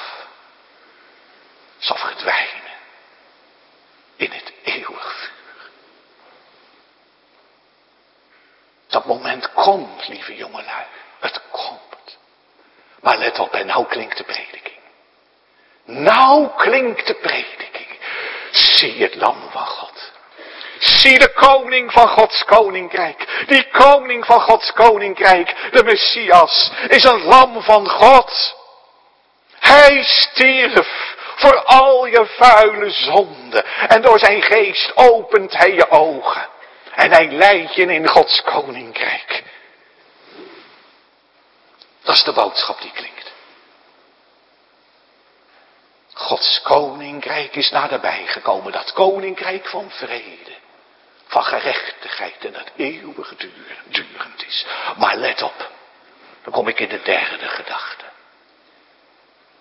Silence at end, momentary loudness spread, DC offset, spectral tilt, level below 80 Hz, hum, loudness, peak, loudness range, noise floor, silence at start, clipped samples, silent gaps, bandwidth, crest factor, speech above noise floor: 1.65 s; 21 LU; under 0.1%; -3 dB/octave; -50 dBFS; none; -13 LUFS; 0 dBFS; 15 LU; -56 dBFS; 0 s; 0.5%; none; 11 kHz; 16 dB; 43 dB